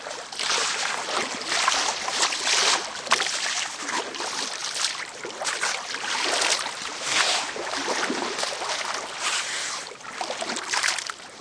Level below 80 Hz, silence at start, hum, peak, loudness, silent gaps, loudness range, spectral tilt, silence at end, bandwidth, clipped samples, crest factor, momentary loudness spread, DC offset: -70 dBFS; 0 s; none; -4 dBFS; -25 LUFS; none; 4 LU; 1 dB/octave; 0 s; 11 kHz; under 0.1%; 24 dB; 9 LU; under 0.1%